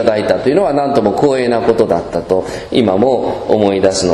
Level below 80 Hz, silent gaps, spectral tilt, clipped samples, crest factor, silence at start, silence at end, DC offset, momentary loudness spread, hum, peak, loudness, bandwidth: -42 dBFS; none; -5.5 dB/octave; 0.1%; 12 dB; 0 s; 0 s; under 0.1%; 5 LU; none; 0 dBFS; -13 LUFS; 12 kHz